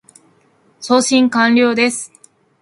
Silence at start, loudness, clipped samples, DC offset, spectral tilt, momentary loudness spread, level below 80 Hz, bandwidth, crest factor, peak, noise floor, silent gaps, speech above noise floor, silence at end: 0.8 s; -13 LUFS; under 0.1%; under 0.1%; -3 dB/octave; 17 LU; -66 dBFS; 11.5 kHz; 16 dB; 0 dBFS; -55 dBFS; none; 42 dB; 0.55 s